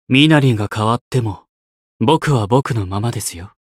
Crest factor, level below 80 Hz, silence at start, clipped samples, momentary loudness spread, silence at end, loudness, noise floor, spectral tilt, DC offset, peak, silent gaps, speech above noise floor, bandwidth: 16 dB; -48 dBFS; 0.1 s; under 0.1%; 14 LU; 0.25 s; -16 LUFS; under -90 dBFS; -5.5 dB/octave; under 0.1%; 0 dBFS; 1.01-1.11 s, 1.49-2.00 s; over 75 dB; 15 kHz